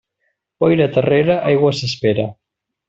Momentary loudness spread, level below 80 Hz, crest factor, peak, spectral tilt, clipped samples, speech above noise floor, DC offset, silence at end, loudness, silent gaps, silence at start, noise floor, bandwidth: 5 LU; -52 dBFS; 14 dB; -2 dBFS; -6.5 dB/octave; under 0.1%; 55 dB; under 0.1%; 0.55 s; -16 LUFS; none; 0.6 s; -70 dBFS; 7.8 kHz